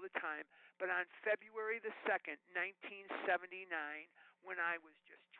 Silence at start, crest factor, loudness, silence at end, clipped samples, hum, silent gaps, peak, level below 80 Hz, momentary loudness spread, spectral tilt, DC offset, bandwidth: 0 s; 20 dB; -42 LUFS; 0 s; under 0.1%; none; none; -24 dBFS; under -90 dBFS; 10 LU; 0 dB/octave; under 0.1%; 4.5 kHz